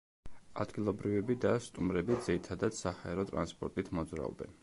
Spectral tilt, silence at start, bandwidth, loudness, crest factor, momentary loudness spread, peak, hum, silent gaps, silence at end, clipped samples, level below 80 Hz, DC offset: -6.5 dB/octave; 0.25 s; 11.5 kHz; -36 LUFS; 18 dB; 8 LU; -18 dBFS; none; none; 0.1 s; under 0.1%; -56 dBFS; under 0.1%